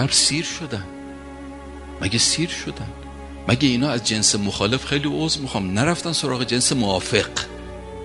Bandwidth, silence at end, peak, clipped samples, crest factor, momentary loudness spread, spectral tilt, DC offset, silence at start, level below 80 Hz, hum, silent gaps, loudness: 11.5 kHz; 0 s; 0 dBFS; under 0.1%; 22 dB; 19 LU; -3 dB/octave; under 0.1%; 0 s; -42 dBFS; none; none; -20 LUFS